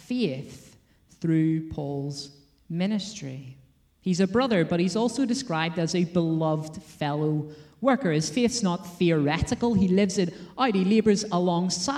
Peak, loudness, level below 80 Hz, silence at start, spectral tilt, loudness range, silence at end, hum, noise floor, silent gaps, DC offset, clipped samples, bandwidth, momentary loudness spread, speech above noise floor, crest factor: -10 dBFS; -25 LUFS; -52 dBFS; 0.1 s; -5.5 dB/octave; 6 LU; 0 s; none; -58 dBFS; none; under 0.1%; under 0.1%; 12.5 kHz; 13 LU; 33 dB; 16 dB